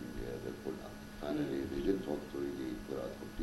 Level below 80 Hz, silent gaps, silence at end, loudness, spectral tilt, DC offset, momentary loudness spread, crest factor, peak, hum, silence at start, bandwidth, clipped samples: -54 dBFS; none; 0 s; -40 LUFS; -6.5 dB/octave; under 0.1%; 8 LU; 18 dB; -20 dBFS; none; 0 s; 16 kHz; under 0.1%